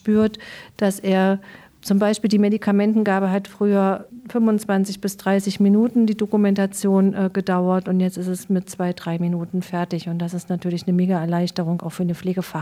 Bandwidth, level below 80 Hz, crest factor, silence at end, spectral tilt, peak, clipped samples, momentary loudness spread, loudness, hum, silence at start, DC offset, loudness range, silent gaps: 14.5 kHz; -62 dBFS; 12 dB; 0 s; -7 dB/octave; -8 dBFS; under 0.1%; 8 LU; -21 LUFS; none; 0.05 s; under 0.1%; 4 LU; none